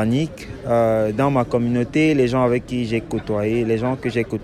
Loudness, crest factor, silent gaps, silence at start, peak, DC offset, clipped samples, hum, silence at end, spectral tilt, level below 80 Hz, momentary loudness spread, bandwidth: -20 LUFS; 14 dB; none; 0 s; -6 dBFS; under 0.1%; under 0.1%; none; 0 s; -7.5 dB/octave; -44 dBFS; 6 LU; 13.5 kHz